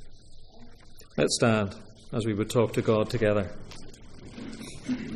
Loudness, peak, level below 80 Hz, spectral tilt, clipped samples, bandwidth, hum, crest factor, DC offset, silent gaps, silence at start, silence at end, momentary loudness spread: -27 LUFS; -10 dBFS; -48 dBFS; -5.5 dB/octave; under 0.1%; 15.5 kHz; none; 20 dB; under 0.1%; none; 0 s; 0 s; 22 LU